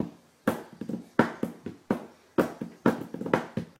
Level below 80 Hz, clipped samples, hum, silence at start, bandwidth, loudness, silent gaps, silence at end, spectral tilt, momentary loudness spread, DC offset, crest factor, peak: -66 dBFS; under 0.1%; none; 0 s; 16 kHz; -31 LUFS; none; 0.1 s; -7 dB/octave; 10 LU; under 0.1%; 26 dB; -6 dBFS